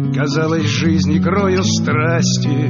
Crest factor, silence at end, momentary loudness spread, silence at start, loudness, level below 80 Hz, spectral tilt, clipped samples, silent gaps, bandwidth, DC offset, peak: 12 dB; 0 s; 2 LU; 0 s; -15 LUFS; -48 dBFS; -5.5 dB/octave; under 0.1%; none; 7.4 kHz; under 0.1%; -4 dBFS